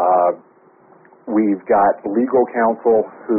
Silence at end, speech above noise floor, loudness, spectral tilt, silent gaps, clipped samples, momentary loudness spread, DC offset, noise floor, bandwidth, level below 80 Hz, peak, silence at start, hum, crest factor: 0 s; 34 dB; -17 LUFS; -1.5 dB/octave; none; under 0.1%; 6 LU; under 0.1%; -50 dBFS; 2.8 kHz; -60 dBFS; -4 dBFS; 0 s; none; 12 dB